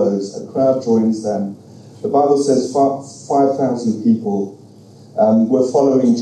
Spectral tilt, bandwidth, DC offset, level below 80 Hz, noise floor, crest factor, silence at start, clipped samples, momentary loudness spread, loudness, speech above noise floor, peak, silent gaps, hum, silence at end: -7 dB/octave; 10 kHz; under 0.1%; -68 dBFS; -42 dBFS; 14 dB; 0 s; under 0.1%; 10 LU; -16 LUFS; 26 dB; -2 dBFS; none; none; 0 s